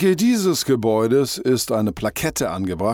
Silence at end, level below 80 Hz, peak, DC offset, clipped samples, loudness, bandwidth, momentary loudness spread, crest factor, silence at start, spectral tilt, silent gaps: 0 s; -48 dBFS; -6 dBFS; under 0.1%; under 0.1%; -20 LUFS; 17.5 kHz; 6 LU; 12 dB; 0 s; -5 dB/octave; none